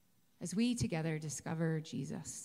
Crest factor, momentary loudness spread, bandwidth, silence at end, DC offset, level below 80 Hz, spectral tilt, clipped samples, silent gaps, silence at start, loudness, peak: 14 dB; 8 LU; 15 kHz; 0 s; under 0.1%; -64 dBFS; -5.5 dB/octave; under 0.1%; none; 0.4 s; -38 LUFS; -24 dBFS